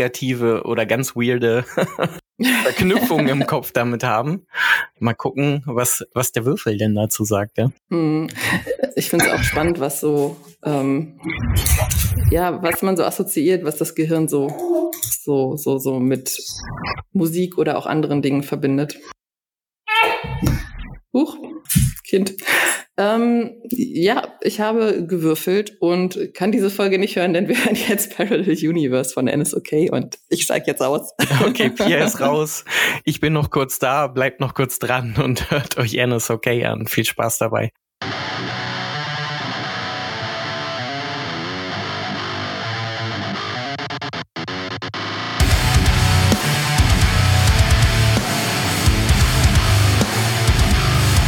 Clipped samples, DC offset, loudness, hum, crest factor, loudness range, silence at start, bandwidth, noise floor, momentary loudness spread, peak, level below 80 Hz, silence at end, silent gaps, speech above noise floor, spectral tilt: under 0.1%; under 0.1%; -19 LUFS; none; 18 dB; 8 LU; 0 s; 19 kHz; under -90 dBFS; 9 LU; -2 dBFS; -30 dBFS; 0 s; none; over 71 dB; -4.5 dB/octave